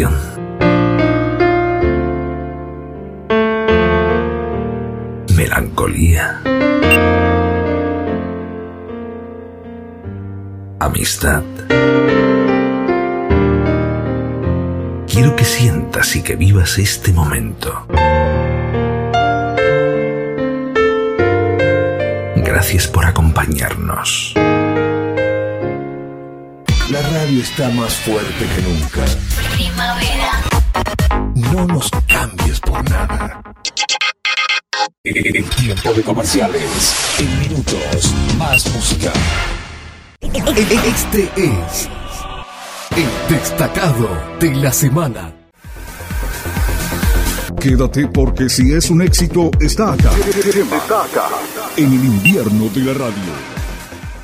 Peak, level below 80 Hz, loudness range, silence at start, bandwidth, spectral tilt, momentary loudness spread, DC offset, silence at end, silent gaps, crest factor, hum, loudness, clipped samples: 0 dBFS; -24 dBFS; 4 LU; 0 s; 16 kHz; -5 dB/octave; 13 LU; under 0.1%; 0 s; 34.98-35.04 s; 14 dB; none; -15 LUFS; under 0.1%